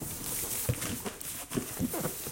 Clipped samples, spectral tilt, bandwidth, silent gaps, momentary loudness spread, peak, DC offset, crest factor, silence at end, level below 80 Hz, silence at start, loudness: under 0.1%; -3.5 dB/octave; 17 kHz; none; 5 LU; -16 dBFS; under 0.1%; 18 dB; 0 s; -54 dBFS; 0 s; -34 LUFS